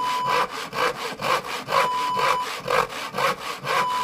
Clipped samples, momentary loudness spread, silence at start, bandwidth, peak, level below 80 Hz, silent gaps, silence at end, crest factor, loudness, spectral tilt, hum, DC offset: under 0.1%; 4 LU; 0 s; 15.5 kHz; -8 dBFS; -58 dBFS; none; 0 s; 16 dB; -24 LUFS; -2.5 dB/octave; none; under 0.1%